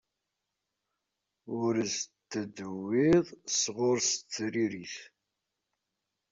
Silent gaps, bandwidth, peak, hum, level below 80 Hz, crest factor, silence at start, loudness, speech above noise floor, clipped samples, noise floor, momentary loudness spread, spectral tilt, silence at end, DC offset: none; 7.8 kHz; -14 dBFS; none; -68 dBFS; 20 dB; 1.45 s; -30 LUFS; 55 dB; under 0.1%; -86 dBFS; 14 LU; -3.5 dB/octave; 1.25 s; under 0.1%